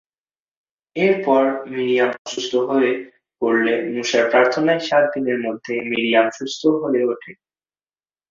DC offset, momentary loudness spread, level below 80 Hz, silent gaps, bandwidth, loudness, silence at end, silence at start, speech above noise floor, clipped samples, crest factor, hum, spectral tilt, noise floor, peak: under 0.1%; 8 LU; -66 dBFS; 2.18-2.25 s; 7.6 kHz; -19 LUFS; 0.95 s; 0.95 s; over 71 dB; under 0.1%; 18 dB; none; -4.5 dB/octave; under -90 dBFS; -2 dBFS